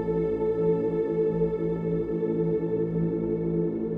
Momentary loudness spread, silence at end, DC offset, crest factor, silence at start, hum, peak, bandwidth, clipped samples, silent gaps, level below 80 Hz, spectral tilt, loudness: 3 LU; 0 s; under 0.1%; 12 dB; 0 s; none; -14 dBFS; 3.8 kHz; under 0.1%; none; -48 dBFS; -11.5 dB/octave; -27 LUFS